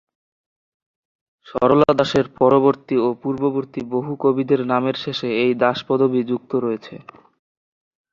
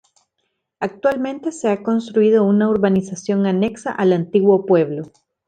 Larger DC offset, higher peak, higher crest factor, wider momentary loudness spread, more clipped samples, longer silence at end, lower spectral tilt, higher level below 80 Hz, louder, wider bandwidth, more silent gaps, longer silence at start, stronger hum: neither; about the same, 0 dBFS vs -2 dBFS; about the same, 20 dB vs 16 dB; about the same, 10 LU vs 10 LU; neither; first, 1.15 s vs 0.4 s; about the same, -7 dB/octave vs -7 dB/octave; about the same, -58 dBFS vs -60 dBFS; about the same, -19 LUFS vs -18 LUFS; second, 7.4 kHz vs 9.2 kHz; neither; first, 1.45 s vs 0.8 s; neither